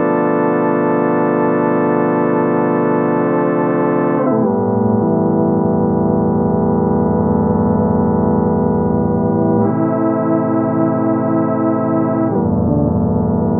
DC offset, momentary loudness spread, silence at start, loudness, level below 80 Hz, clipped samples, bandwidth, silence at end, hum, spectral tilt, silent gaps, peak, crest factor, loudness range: under 0.1%; 1 LU; 0 s; -15 LUFS; -38 dBFS; under 0.1%; 3.7 kHz; 0 s; none; -14 dB/octave; none; -2 dBFS; 12 dB; 1 LU